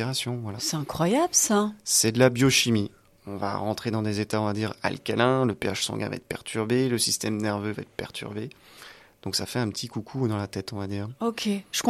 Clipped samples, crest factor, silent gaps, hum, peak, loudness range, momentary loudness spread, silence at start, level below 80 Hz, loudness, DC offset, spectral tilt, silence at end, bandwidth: under 0.1%; 20 dB; none; none; -6 dBFS; 8 LU; 14 LU; 0 s; -60 dBFS; -26 LUFS; under 0.1%; -4 dB/octave; 0 s; 15 kHz